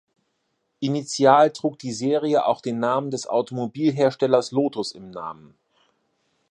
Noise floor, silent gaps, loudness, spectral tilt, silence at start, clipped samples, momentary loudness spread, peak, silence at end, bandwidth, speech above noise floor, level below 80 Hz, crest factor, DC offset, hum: -73 dBFS; none; -22 LUFS; -5.5 dB/octave; 0.8 s; under 0.1%; 14 LU; -2 dBFS; 1.15 s; 11 kHz; 52 dB; -72 dBFS; 20 dB; under 0.1%; none